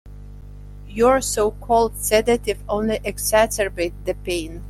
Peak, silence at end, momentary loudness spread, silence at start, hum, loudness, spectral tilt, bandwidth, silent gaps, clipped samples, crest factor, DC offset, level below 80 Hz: -4 dBFS; 0 s; 23 LU; 0.05 s; 50 Hz at -35 dBFS; -20 LUFS; -3.5 dB/octave; 16 kHz; none; under 0.1%; 18 dB; under 0.1%; -36 dBFS